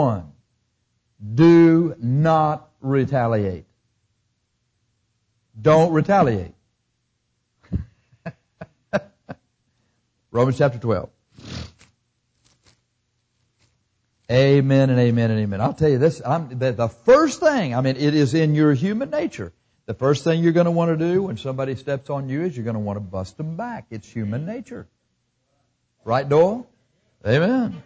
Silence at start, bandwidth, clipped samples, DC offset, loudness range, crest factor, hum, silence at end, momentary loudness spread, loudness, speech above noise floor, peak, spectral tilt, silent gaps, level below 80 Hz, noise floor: 0 s; 8 kHz; under 0.1%; under 0.1%; 11 LU; 16 dB; 60 Hz at -50 dBFS; 0.05 s; 19 LU; -20 LUFS; 53 dB; -6 dBFS; -7.5 dB/octave; none; -48 dBFS; -72 dBFS